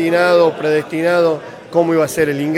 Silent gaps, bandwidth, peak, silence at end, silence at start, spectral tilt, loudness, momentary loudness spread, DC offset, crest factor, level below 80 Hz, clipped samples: none; 16 kHz; -2 dBFS; 0 s; 0 s; -5.5 dB/octave; -15 LUFS; 5 LU; under 0.1%; 14 dB; -56 dBFS; under 0.1%